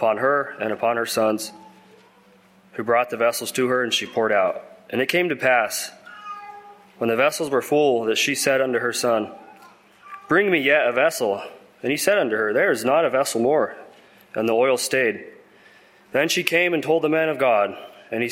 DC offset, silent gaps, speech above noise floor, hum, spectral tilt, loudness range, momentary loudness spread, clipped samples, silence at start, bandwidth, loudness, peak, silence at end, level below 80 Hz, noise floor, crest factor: under 0.1%; none; 33 dB; none; -3 dB/octave; 3 LU; 15 LU; under 0.1%; 0 s; 16.5 kHz; -21 LUFS; 0 dBFS; 0 s; -68 dBFS; -54 dBFS; 22 dB